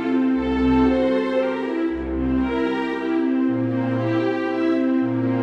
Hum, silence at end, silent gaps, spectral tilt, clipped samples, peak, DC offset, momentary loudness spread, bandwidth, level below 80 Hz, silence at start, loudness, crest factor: none; 0 s; none; -8.5 dB/octave; under 0.1%; -8 dBFS; under 0.1%; 5 LU; 6.2 kHz; -38 dBFS; 0 s; -21 LUFS; 12 dB